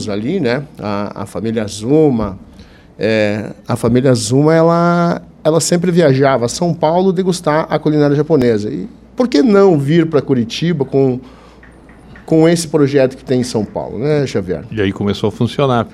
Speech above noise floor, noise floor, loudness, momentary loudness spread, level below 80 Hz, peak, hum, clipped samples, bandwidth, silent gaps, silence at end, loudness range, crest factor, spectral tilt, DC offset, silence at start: 27 dB; -40 dBFS; -14 LUFS; 10 LU; -44 dBFS; 0 dBFS; none; under 0.1%; 14 kHz; none; 0.05 s; 4 LU; 14 dB; -6 dB/octave; under 0.1%; 0 s